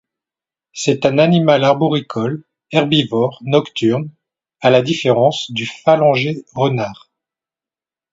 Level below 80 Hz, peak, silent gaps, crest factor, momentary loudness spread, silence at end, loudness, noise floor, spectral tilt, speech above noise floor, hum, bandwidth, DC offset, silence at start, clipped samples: -58 dBFS; 0 dBFS; none; 16 dB; 10 LU; 1.2 s; -16 LUFS; under -90 dBFS; -6 dB/octave; over 75 dB; none; 8 kHz; under 0.1%; 0.75 s; under 0.1%